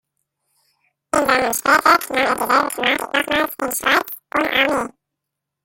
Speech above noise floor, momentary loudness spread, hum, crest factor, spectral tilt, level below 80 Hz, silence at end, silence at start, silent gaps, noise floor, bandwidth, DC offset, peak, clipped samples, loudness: 63 dB; 7 LU; none; 20 dB; -2 dB/octave; -54 dBFS; 0.75 s; 1.15 s; none; -81 dBFS; 17 kHz; under 0.1%; 0 dBFS; under 0.1%; -17 LUFS